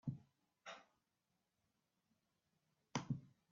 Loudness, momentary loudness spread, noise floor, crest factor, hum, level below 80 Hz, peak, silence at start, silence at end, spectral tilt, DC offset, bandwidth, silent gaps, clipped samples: -51 LUFS; 14 LU; -88 dBFS; 28 dB; none; -80 dBFS; -26 dBFS; 0.05 s; 0.2 s; -5.5 dB/octave; under 0.1%; 7.2 kHz; none; under 0.1%